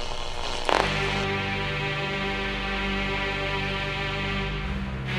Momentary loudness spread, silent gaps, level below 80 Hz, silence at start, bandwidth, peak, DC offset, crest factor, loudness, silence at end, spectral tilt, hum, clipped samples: 7 LU; none; -36 dBFS; 0 s; 15 kHz; -4 dBFS; under 0.1%; 24 dB; -27 LUFS; 0 s; -4.5 dB/octave; 50 Hz at -45 dBFS; under 0.1%